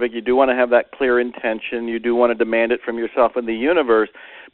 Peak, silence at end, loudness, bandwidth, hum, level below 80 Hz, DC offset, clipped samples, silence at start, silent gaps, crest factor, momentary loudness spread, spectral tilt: -2 dBFS; 0.05 s; -18 LUFS; 4.2 kHz; none; -52 dBFS; under 0.1%; under 0.1%; 0 s; none; 16 dB; 7 LU; -2 dB/octave